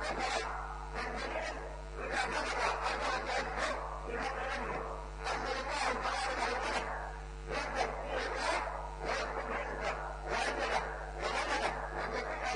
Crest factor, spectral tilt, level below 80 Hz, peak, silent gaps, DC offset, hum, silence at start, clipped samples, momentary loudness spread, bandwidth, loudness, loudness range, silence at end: 18 dB; -3.5 dB/octave; -46 dBFS; -20 dBFS; none; under 0.1%; none; 0 s; under 0.1%; 7 LU; 10 kHz; -36 LUFS; 1 LU; 0 s